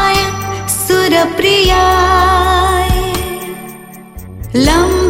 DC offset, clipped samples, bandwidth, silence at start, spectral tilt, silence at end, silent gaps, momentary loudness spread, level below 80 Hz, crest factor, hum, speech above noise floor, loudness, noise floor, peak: under 0.1%; under 0.1%; 17 kHz; 0 s; -4 dB/octave; 0 s; none; 19 LU; -22 dBFS; 12 dB; none; 23 dB; -11 LUFS; -32 dBFS; 0 dBFS